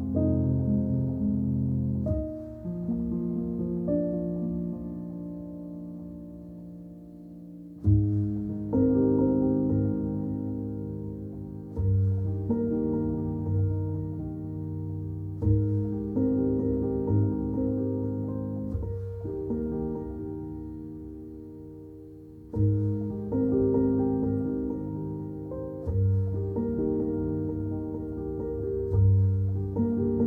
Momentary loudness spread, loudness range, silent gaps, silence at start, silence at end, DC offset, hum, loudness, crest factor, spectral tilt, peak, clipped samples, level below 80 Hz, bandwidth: 16 LU; 7 LU; none; 0 s; 0 s; under 0.1%; none; -29 LUFS; 16 dB; -13.5 dB/octave; -12 dBFS; under 0.1%; -44 dBFS; 2 kHz